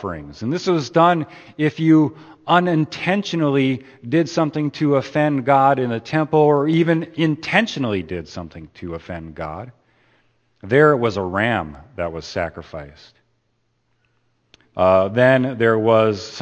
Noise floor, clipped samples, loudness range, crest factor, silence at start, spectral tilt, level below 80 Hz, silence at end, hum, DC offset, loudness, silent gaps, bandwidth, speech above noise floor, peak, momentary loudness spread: -67 dBFS; under 0.1%; 8 LU; 18 dB; 0 s; -7 dB/octave; -52 dBFS; 0 s; none; under 0.1%; -18 LUFS; none; 8.6 kHz; 49 dB; 0 dBFS; 17 LU